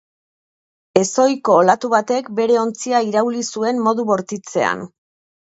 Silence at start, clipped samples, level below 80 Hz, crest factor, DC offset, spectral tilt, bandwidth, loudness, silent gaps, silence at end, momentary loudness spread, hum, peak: 0.95 s; under 0.1%; -66 dBFS; 18 dB; under 0.1%; -4.5 dB/octave; 8.2 kHz; -18 LUFS; none; 0.55 s; 7 LU; none; 0 dBFS